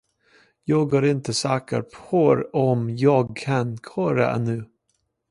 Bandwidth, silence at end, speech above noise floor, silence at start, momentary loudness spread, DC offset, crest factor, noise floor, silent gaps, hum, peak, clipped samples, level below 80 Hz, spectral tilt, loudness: 11.5 kHz; 0.65 s; 51 dB; 0.65 s; 9 LU; under 0.1%; 18 dB; -73 dBFS; none; none; -4 dBFS; under 0.1%; -60 dBFS; -6.5 dB/octave; -22 LUFS